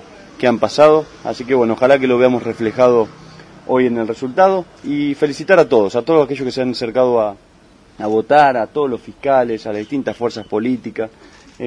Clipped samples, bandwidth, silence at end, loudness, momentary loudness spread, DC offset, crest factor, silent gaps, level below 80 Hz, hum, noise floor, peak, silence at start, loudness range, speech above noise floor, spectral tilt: under 0.1%; 10.5 kHz; 0 s; -16 LUFS; 11 LU; under 0.1%; 16 dB; none; -54 dBFS; none; -47 dBFS; 0 dBFS; 0.1 s; 3 LU; 32 dB; -6 dB/octave